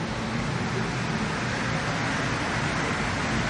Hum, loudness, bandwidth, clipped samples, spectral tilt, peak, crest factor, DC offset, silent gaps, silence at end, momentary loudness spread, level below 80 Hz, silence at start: none; -27 LUFS; 11 kHz; under 0.1%; -4.5 dB/octave; -14 dBFS; 14 dB; under 0.1%; none; 0 s; 2 LU; -44 dBFS; 0 s